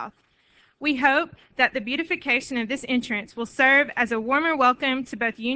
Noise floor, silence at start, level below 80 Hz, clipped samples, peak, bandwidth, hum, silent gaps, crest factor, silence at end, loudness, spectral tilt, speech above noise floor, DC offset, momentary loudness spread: -61 dBFS; 0 s; -62 dBFS; under 0.1%; -4 dBFS; 8 kHz; none; none; 20 dB; 0 s; -22 LUFS; -3.5 dB/octave; 37 dB; under 0.1%; 11 LU